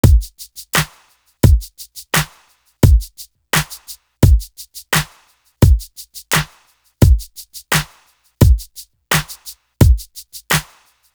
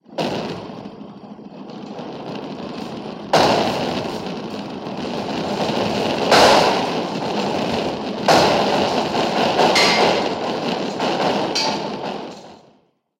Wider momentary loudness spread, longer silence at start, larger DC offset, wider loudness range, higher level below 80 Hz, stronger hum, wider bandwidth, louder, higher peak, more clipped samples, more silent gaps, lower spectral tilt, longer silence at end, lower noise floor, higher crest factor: about the same, 20 LU vs 19 LU; about the same, 0.05 s vs 0.1 s; neither; second, 1 LU vs 6 LU; first, -20 dBFS vs -52 dBFS; neither; first, over 20 kHz vs 16 kHz; first, -16 LUFS vs -19 LUFS; about the same, 0 dBFS vs 0 dBFS; neither; neither; about the same, -4.5 dB/octave vs -4 dB/octave; about the same, 0.55 s vs 0.6 s; second, -54 dBFS vs -58 dBFS; about the same, 16 dB vs 20 dB